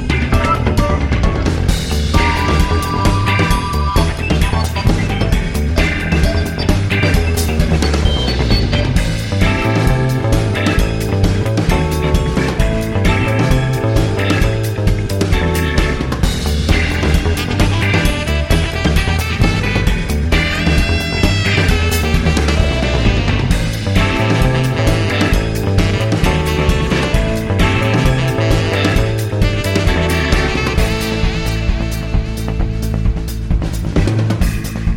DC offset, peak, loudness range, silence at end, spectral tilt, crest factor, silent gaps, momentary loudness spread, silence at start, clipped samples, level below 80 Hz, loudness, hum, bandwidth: under 0.1%; 0 dBFS; 1 LU; 0 s; -5.5 dB/octave; 14 dB; none; 4 LU; 0 s; under 0.1%; -18 dBFS; -15 LUFS; none; 17 kHz